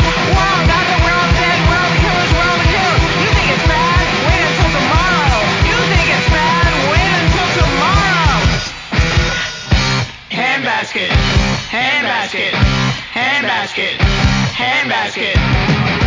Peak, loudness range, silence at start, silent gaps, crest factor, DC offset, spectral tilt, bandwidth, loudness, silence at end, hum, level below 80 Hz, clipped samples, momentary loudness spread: 0 dBFS; 3 LU; 0 s; none; 14 dB; under 0.1%; -4.5 dB/octave; 7.6 kHz; -13 LUFS; 0 s; none; -20 dBFS; under 0.1%; 4 LU